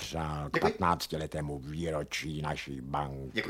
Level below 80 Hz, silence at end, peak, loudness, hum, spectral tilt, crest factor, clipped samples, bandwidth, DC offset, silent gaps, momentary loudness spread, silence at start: -50 dBFS; 0 s; -12 dBFS; -34 LUFS; none; -5 dB/octave; 22 dB; under 0.1%; 16.5 kHz; under 0.1%; none; 8 LU; 0 s